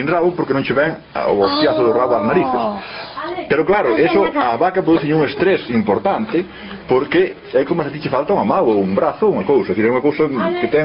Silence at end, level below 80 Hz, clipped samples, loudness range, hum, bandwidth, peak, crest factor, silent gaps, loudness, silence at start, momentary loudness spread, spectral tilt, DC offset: 0 s; -50 dBFS; under 0.1%; 2 LU; none; 5.6 kHz; -2 dBFS; 14 dB; none; -16 LUFS; 0 s; 6 LU; -4.5 dB/octave; under 0.1%